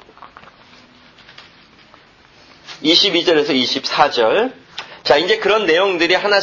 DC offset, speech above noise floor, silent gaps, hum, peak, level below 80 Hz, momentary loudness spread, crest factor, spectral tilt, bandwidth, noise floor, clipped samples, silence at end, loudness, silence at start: under 0.1%; 33 dB; none; none; 0 dBFS; -58 dBFS; 12 LU; 18 dB; -3 dB/octave; 7.4 kHz; -47 dBFS; under 0.1%; 0 s; -14 LUFS; 0.2 s